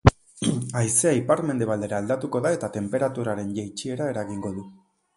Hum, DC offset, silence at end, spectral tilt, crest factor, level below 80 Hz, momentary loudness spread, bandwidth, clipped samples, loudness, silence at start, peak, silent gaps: none; under 0.1%; 0.45 s; -5.5 dB/octave; 24 dB; -42 dBFS; 11 LU; 11.5 kHz; under 0.1%; -25 LUFS; 0.05 s; 0 dBFS; none